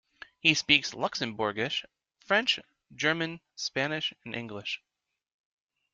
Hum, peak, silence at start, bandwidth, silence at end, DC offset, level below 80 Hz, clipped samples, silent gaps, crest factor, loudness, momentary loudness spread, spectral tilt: none; -4 dBFS; 0.45 s; 9.2 kHz; 1.15 s; under 0.1%; -70 dBFS; under 0.1%; none; 28 dB; -29 LUFS; 12 LU; -3 dB/octave